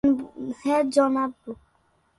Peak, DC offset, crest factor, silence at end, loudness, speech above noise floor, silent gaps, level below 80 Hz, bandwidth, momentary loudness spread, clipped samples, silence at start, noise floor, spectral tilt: -6 dBFS; under 0.1%; 18 dB; 0.65 s; -24 LUFS; 42 dB; none; -58 dBFS; 11.5 kHz; 20 LU; under 0.1%; 0.05 s; -66 dBFS; -5.5 dB/octave